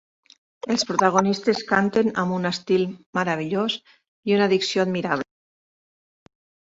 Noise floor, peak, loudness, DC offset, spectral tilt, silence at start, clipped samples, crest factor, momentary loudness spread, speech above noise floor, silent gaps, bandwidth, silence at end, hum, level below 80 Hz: under -90 dBFS; -4 dBFS; -22 LUFS; under 0.1%; -5 dB/octave; 0.65 s; under 0.1%; 20 dB; 8 LU; over 68 dB; 3.06-3.13 s, 4.08-4.23 s; 8 kHz; 1.45 s; none; -64 dBFS